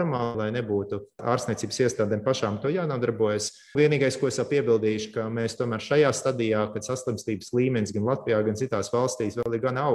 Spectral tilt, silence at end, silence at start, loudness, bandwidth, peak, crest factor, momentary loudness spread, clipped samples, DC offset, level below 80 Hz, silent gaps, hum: -5.5 dB/octave; 0 s; 0 s; -26 LUFS; 12.5 kHz; -8 dBFS; 16 dB; 7 LU; under 0.1%; under 0.1%; -62 dBFS; none; none